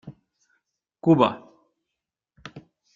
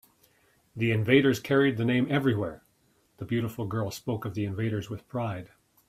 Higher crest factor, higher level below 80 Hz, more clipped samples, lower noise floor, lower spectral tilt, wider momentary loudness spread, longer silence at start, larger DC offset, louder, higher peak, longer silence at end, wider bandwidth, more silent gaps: about the same, 24 dB vs 22 dB; about the same, -66 dBFS vs -62 dBFS; neither; first, -85 dBFS vs -67 dBFS; first, -8.5 dB/octave vs -6.5 dB/octave; first, 25 LU vs 13 LU; second, 0.05 s vs 0.75 s; neither; first, -21 LUFS vs -28 LUFS; first, -2 dBFS vs -6 dBFS; about the same, 0.35 s vs 0.4 s; second, 7.2 kHz vs 15 kHz; neither